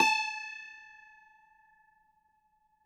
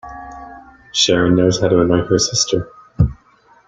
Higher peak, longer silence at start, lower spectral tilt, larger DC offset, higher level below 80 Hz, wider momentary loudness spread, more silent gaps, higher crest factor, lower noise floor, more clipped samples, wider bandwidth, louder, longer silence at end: second, -10 dBFS vs 0 dBFS; about the same, 0 s vs 0.05 s; second, 0 dB/octave vs -4.5 dB/octave; neither; second, -84 dBFS vs -36 dBFS; first, 26 LU vs 20 LU; neither; first, 26 dB vs 16 dB; first, -72 dBFS vs -51 dBFS; neither; first, 14.5 kHz vs 9.4 kHz; second, -32 LUFS vs -15 LUFS; first, 1.95 s vs 0.55 s